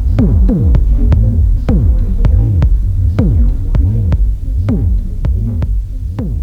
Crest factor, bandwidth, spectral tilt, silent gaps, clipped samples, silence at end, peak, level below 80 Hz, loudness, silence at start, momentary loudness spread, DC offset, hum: 10 dB; 3.6 kHz; -10.5 dB/octave; none; under 0.1%; 0 s; 0 dBFS; -12 dBFS; -14 LUFS; 0 s; 6 LU; 0.3%; none